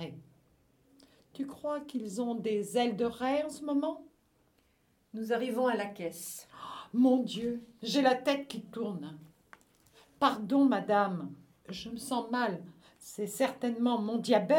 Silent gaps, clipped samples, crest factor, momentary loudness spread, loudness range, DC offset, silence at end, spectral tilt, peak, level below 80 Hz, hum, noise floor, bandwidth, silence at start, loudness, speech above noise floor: none; under 0.1%; 22 dB; 17 LU; 4 LU; under 0.1%; 0 s; -5 dB/octave; -12 dBFS; -72 dBFS; none; -71 dBFS; 18.5 kHz; 0 s; -32 LUFS; 40 dB